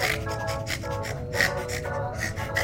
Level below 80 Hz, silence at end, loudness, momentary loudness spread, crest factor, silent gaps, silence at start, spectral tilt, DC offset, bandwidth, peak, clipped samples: -42 dBFS; 0 s; -28 LUFS; 6 LU; 22 dB; none; 0 s; -4 dB/octave; under 0.1%; 16.5 kHz; -6 dBFS; under 0.1%